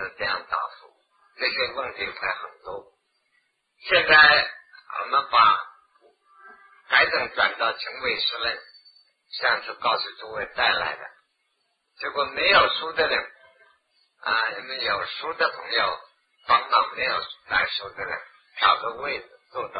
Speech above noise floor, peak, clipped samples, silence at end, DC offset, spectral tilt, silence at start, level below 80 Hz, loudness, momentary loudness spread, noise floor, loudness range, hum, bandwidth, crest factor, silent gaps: 49 dB; -2 dBFS; under 0.1%; 0 s; under 0.1%; -5 dB/octave; 0 s; -60 dBFS; -22 LUFS; 18 LU; -73 dBFS; 7 LU; none; 5 kHz; 24 dB; none